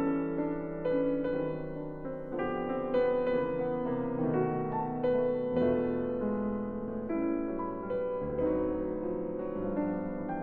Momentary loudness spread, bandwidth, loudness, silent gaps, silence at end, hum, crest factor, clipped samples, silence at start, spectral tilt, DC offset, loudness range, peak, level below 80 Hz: 7 LU; 4.3 kHz; -32 LUFS; none; 0 s; none; 14 dB; under 0.1%; 0 s; -11 dB/octave; under 0.1%; 3 LU; -18 dBFS; -52 dBFS